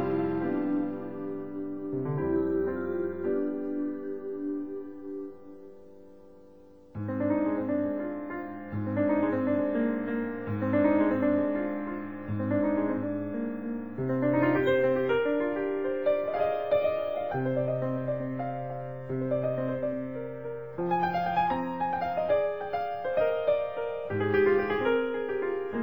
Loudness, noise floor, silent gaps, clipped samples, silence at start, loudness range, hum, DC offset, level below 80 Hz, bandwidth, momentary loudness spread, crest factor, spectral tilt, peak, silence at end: -29 LUFS; -54 dBFS; none; under 0.1%; 0 s; 6 LU; none; 0.3%; -62 dBFS; over 20 kHz; 11 LU; 18 dB; -9.5 dB/octave; -12 dBFS; 0 s